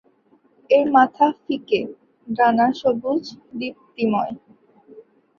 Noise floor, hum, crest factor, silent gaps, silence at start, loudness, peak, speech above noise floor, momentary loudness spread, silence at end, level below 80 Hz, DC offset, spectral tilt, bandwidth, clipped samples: -59 dBFS; none; 18 dB; none; 0.7 s; -20 LUFS; -2 dBFS; 39 dB; 15 LU; 0.4 s; -66 dBFS; under 0.1%; -6.5 dB/octave; 7 kHz; under 0.1%